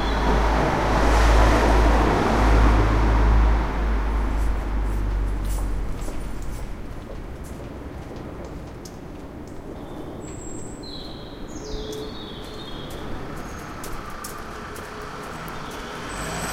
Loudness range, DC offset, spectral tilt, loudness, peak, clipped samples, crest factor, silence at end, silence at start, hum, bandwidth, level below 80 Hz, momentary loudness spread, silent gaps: 17 LU; under 0.1%; -6 dB/octave; -24 LUFS; -6 dBFS; under 0.1%; 18 dB; 0 s; 0 s; none; 13.5 kHz; -24 dBFS; 18 LU; none